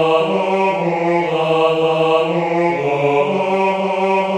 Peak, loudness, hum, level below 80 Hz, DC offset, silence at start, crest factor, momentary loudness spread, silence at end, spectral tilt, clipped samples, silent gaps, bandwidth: -2 dBFS; -16 LUFS; none; -60 dBFS; under 0.1%; 0 s; 14 dB; 2 LU; 0 s; -6.5 dB/octave; under 0.1%; none; 9.8 kHz